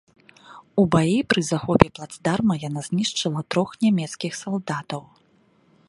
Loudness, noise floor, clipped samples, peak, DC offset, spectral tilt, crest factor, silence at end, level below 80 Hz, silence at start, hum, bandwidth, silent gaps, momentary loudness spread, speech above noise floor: -23 LUFS; -60 dBFS; under 0.1%; 0 dBFS; under 0.1%; -5.5 dB/octave; 24 dB; 0.9 s; -48 dBFS; 0.5 s; none; 11.5 kHz; none; 10 LU; 38 dB